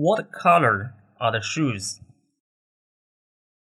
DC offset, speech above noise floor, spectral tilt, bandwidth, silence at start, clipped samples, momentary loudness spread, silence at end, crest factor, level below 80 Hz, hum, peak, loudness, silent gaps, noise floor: under 0.1%; over 68 dB; -5 dB/octave; 12.5 kHz; 0 s; under 0.1%; 15 LU; 1.85 s; 18 dB; -66 dBFS; none; -6 dBFS; -22 LUFS; none; under -90 dBFS